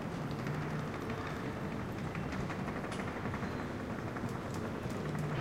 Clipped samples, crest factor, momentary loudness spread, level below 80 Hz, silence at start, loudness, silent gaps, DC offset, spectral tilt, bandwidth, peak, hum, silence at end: under 0.1%; 14 dB; 2 LU; -54 dBFS; 0 s; -39 LUFS; none; under 0.1%; -6.5 dB/octave; 16.5 kHz; -24 dBFS; none; 0 s